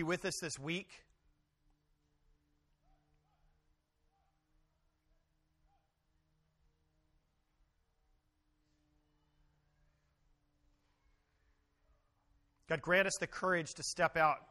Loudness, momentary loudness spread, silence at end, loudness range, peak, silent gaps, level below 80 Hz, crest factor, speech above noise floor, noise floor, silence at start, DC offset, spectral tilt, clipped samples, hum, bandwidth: -36 LUFS; 10 LU; 0.1 s; 14 LU; -18 dBFS; none; -72 dBFS; 26 dB; 43 dB; -79 dBFS; 0 s; under 0.1%; -3.5 dB/octave; under 0.1%; none; 12 kHz